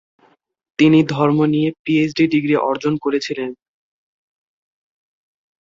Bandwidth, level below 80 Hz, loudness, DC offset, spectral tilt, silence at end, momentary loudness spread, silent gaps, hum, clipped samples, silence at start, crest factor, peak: 7.6 kHz; -60 dBFS; -17 LUFS; under 0.1%; -7 dB/octave; 2.05 s; 11 LU; 1.79-1.85 s; none; under 0.1%; 0.8 s; 16 dB; -2 dBFS